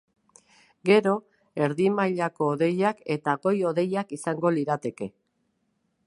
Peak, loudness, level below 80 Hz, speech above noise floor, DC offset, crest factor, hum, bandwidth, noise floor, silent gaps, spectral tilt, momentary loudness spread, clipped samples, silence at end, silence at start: -6 dBFS; -25 LUFS; -74 dBFS; 49 dB; under 0.1%; 20 dB; none; 11.5 kHz; -74 dBFS; none; -6.5 dB/octave; 10 LU; under 0.1%; 0.95 s; 0.85 s